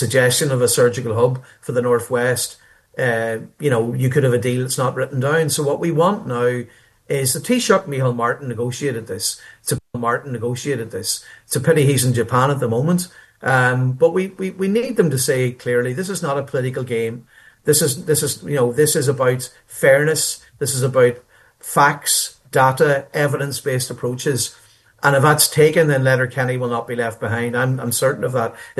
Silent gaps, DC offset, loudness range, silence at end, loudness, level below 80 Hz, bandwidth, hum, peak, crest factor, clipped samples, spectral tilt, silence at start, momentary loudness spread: none; under 0.1%; 3 LU; 0.1 s; -18 LUFS; -58 dBFS; 13 kHz; none; 0 dBFS; 18 dB; under 0.1%; -4.5 dB/octave; 0 s; 9 LU